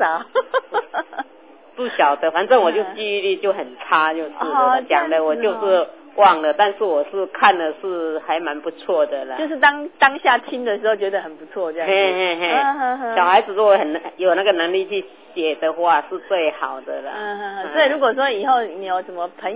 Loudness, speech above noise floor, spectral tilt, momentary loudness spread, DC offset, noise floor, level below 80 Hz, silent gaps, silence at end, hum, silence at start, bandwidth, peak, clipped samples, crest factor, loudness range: -19 LUFS; 28 dB; -6.5 dB/octave; 12 LU; 0.1%; -46 dBFS; -74 dBFS; none; 0 s; none; 0 s; 4 kHz; 0 dBFS; under 0.1%; 18 dB; 3 LU